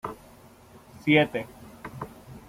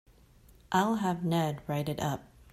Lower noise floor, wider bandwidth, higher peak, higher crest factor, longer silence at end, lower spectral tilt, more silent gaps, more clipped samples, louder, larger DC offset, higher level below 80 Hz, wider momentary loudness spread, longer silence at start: second, -52 dBFS vs -59 dBFS; about the same, 16 kHz vs 15 kHz; first, -8 dBFS vs -14 dBFS; about the same, 22 dB vs 20 dB; second, 0.1 s vs 0.3 s; about the same, -6.5 dB/octave vs -6 dB/octave; neither; neither; first, -24 LUFS vs -31 LUFS; neither; about the same, -60 dBFS vs -60 dBFS; first, 22 LU vs 6 LU; second, 0.05 s vs 0.7 s